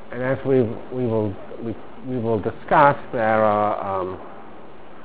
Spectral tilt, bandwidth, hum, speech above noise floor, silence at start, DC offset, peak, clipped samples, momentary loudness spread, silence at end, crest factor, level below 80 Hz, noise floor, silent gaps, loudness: -11 dB/octave; 4 kHz; none; 22 dB; 0 s; 2%; 0 dBFS; under 0.1%; 16 LU; 0 s; 22 dB; -52 dBFS; -43 dBFS; none; -21 LUFS